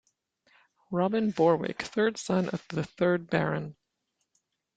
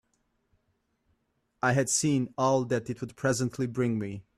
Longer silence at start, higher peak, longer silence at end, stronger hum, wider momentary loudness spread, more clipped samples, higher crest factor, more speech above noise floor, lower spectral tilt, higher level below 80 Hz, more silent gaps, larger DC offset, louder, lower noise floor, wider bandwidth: second, 0.9 s vs 1.65 s; about the same, -10 dBFS vs -12 dBFS; first, 1.05 s vs 0.15 s; neither; first, 10 LU vs 6 LU; neither; about the same, 20 dB vs 18 dB; first, 53 dB vs 47 dB; first, -6.5 dB/octave vs -5 dB/octave; about the same, -66 dBFS vs -64 dBFS; neither; neither; about the same, -28 LUFS vs -28 LUFS; first, -81 dBFS vs -75 dBFS; second, 9.2 kHz vs 13.5 kHz